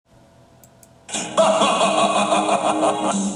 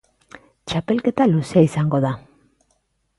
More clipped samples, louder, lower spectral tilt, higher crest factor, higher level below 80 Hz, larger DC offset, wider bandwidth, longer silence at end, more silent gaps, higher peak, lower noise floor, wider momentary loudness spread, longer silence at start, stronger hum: neither; about the same, -18 LUFS vs -19 LUFS; second, -3.5 dB/octave vs -7.5 dB/octave; about the same, 16 dB vs 18 dB; second, -64 dBFS vs -54 dBFS; neither; first, 15 kHz vs 11.5 kHz; second, 0 s vs 1 s; neither; about the same, -4 dBFS vs -4 dBFS; second, -51 dBFS vs -67 dBFS; second, 7 LU vs 11 LU; first, 1.1 s vs 0.65 s; neither